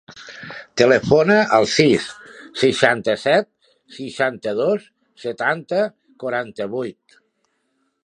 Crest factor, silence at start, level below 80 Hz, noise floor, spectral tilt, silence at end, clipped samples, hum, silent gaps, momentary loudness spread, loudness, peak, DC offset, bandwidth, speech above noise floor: 20 dB; 0.15 s; -56 dBFS; -69 dBFS; -4.5 dB/octave; 1.15 s; under 0.1%; none; none; 19 LU; -18 LUFS; 0 dBFS; under 0.1%; 11 kHz; 51 dB